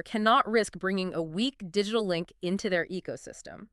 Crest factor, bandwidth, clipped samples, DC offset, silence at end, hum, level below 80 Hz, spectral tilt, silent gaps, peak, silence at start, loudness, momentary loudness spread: 20 dB; 12 kHz; under 0.1%; under 0.1%; 0.05 s; none; -62 dBFS; -5 dB/octave; none; -10 dBFS; 0.05 s; -29 LUFS; 15 LU